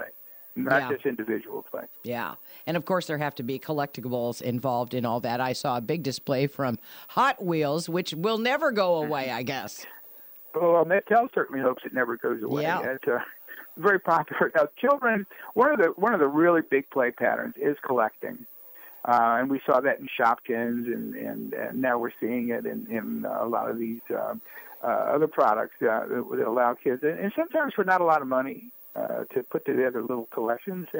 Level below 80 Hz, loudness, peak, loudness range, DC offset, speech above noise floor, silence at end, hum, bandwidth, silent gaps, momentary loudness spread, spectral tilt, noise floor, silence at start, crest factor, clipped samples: -74 dBFS; -26 LUFS; -8 dBFS; 6 LU; under 0.1%; 21 dB; 0 s; none; 16.5 kHz; none; 13 LU; -6 dB/octave; -47 dBFS; 0 s; 18 dB; under 0.1%